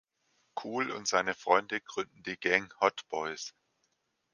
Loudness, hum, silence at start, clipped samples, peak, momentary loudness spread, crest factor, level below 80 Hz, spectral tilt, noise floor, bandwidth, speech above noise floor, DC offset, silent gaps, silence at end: -31 LUFS; none; 0.55 s; under 0.1%; -8 dBFS; 13 LU; 24 dB; -74 dBFS; -2.5 dB/octave; -78 dBFS; 10 kHz; 46 dB; under 0.1%; none; 0.85 s